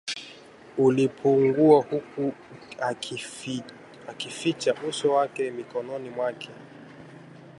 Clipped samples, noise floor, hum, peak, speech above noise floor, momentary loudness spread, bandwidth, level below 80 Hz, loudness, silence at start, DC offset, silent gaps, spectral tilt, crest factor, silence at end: under 0.1%; -48 dBFS; none; -6 dBFS; 23 dB; 25 LU; 11.5 kHz; -70 dBFS; -26 LUFS; 0.05 s; under 0.1%; none; -5.5 dB/octave; 22 dB; 0.1 s